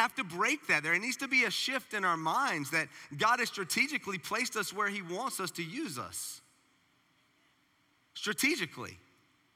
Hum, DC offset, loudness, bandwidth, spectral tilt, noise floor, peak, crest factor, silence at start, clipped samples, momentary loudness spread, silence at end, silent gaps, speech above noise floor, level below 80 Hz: none; under 0.1%; -32 LUFS; 17 kHz; -2.5 dB/octave; -71 dBFS; -14 dBFS; 20 dB; 0 s; under 0.1%; 11 LU; 0.6 s; none; 38 dB; -82 dBFS